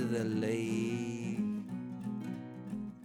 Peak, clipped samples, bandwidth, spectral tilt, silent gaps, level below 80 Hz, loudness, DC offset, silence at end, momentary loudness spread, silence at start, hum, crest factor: -22 dBFS; under 0.1%; 13.5 kHz; -6.5 dB/octave; none; -70 dBFS; -37 LUFS; under 0.1%; 0 s; 9 LU; 0 s; none; 14 dB